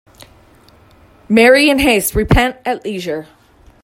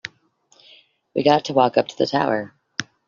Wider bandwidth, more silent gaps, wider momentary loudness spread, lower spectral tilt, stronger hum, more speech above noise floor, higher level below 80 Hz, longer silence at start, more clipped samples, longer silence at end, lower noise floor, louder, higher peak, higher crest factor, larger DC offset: first, 16.5 kHz vs 7.4 kHz; neither; about the same, 14 LU vs 14 LU; about the same, -4.5 dB/octave vs -3.5 dB/octave; neither; second, 34 dB vs 41 dB; first, -30 dBFS vs -64 dBFS; first, 1.3 s vs 0.05 s; neither; first, 0.6 s vs 0.25 s; second, -47 dBFS vs -60 dBFS; first, -13 LUFS vs -21 LUFS; about the same, 0 dBFS vs -2 dBFS; about the same, 16 dB vs 20 dB; neither